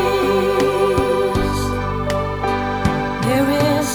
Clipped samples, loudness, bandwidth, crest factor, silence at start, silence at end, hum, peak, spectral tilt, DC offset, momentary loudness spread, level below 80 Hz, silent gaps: under 0.1%; -18 LUFS; over 20 kHz; 14 dB; 0 s; 0 s; 50 Hz at -40 dBFS; -4 dBFS; -5.5 dB/octave; under 0.1%; 5 LU; -32 dBFS; none